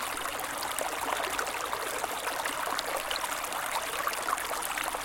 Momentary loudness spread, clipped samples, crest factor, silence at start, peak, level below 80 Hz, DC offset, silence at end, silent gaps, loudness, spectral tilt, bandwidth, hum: 2 LU; under 0.1%; 22 dB; 0 s; -10 dBFS; -60 dBFS; under 0.1%; 0 s; none; -32 LUFS; -0.5 dB/octave; 17 kHz; none